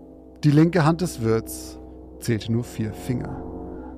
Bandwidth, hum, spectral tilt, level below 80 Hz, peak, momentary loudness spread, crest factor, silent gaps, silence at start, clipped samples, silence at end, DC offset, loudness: 15.5 kHz; none; -7 dB/octave; -44 dBFS; -4 dBFS; 18 LU; 20 dB; none; 0 s; under 0.1%; 0 s; under 0.1%; -23 LUFS